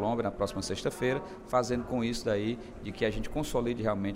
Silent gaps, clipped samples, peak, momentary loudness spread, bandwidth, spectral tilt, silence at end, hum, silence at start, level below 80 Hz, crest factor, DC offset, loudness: none; under 0.1%; -14 dBFS; 5 LU; 16 kHz; -5.5 dB/octave; 0 s; none; 0 s; -46 dBFS; 18 dB; under 0.1%; -32 LUFS